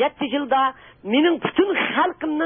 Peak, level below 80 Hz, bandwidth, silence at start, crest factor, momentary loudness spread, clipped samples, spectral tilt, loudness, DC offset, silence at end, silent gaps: -6 dBFS; -60 dBFS; 3.7 kHz; 0 s; 16 dB; 5 LU; under 0.1%; -9.5 dB/octave; -21 LUFS; under 0.1%; 0 s; none